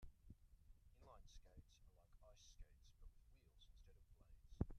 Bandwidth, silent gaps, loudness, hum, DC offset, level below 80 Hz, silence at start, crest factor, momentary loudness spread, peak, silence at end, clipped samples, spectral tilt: 12.5 kHz; none; -62 LUFS; none; under 0.1%; -64 dBFS; 0 s; 30 dB; 9 LU; -28 dBFS; 0 s; under 0.1%; -7 dB/octave